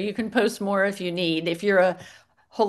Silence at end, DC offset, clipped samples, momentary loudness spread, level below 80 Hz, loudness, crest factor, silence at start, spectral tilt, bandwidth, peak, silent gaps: 0 s; under 0.1%; under 0.1%; 6 LU; -70 dBFS; -23 LUFS; 16 dB; 0 s; -5 dB/octave; 12.5 kHz; -8 dBFS; none